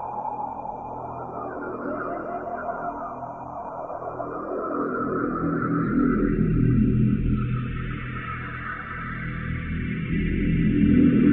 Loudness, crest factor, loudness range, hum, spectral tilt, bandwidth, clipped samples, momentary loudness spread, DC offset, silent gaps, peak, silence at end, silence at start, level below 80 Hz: -26 LUFS; 16 dB; 8 LU; none; -11.5 dB/octave; 3.9 kHz; under 0.1%; 13 LU; under 0.1%; none; -8 dBFS; 0 s; 0 s; -36 dBFS